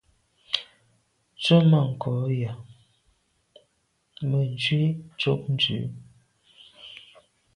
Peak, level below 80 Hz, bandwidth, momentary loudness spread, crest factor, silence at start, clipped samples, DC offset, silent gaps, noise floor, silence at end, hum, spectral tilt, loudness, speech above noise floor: -4 dBFS; -64 dBFS; 10.5 kHz; 24 LU; 22 dB; 0.5 s; under 0.1%; under 0.1%; none; -71 dBFS; 0.6 s; none; -7 dB/octave; -25 LUFS; 48 dB